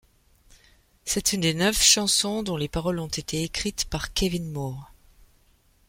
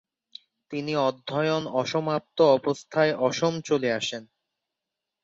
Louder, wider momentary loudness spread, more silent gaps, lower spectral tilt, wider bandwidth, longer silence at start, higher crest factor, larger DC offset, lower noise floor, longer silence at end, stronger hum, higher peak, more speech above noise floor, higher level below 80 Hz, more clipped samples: about the same, -24 LUFS vs -25 LUFS; first, 15 LU vs 9 LU; neither; second, -2.5 dB/octave vs -5 dB/octave; first, 16.5 kHz vs 8 kHz; first, 1.05 s vs 0.7 s; first, 24 dB vs 18 dB; neither; second, -61 dBFS vs -86 dBFS; about the same, 1.05 s vs 1 s; neither; first, -4 dBFS vs -8 dBFS; second, 36 dB vs 61 dB; first, -44 dBFS vs -70 dBFS; neither